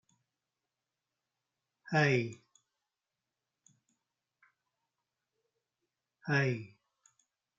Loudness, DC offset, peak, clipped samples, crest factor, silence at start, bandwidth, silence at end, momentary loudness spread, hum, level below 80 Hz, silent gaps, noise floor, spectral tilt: -32 LUFS; under 0.1%; -14 dBFS; under 0.1%; 26 dB; 1.85 s; 7.6 kHz; 0.9 s; 17 LU; none; -80 dBFS; none; under -90 dBFS; -6.5 dB/octave